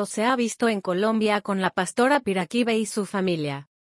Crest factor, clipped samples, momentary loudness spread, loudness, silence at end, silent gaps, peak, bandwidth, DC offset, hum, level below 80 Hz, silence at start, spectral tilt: 16 dB; under 0.1%; 5 LU; -24 LUFS; 0.2 s; none; -8 dBFS; 12 kHz; under 0.1%; none; -68 dBFS; 0 s; -4.5 dB/octave